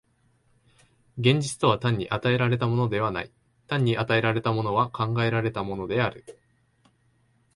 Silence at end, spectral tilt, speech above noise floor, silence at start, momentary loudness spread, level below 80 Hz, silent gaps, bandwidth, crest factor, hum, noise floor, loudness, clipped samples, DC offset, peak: 1.25 s; -6 dB/octave; 41 dB; 1.15 s; 7 LU; -56 dBFS; none; 11.5 kHz; 20 dB; none; -66 dBFS; -25 LUFS; under 0.1%; under 0.1%; -6 dBFS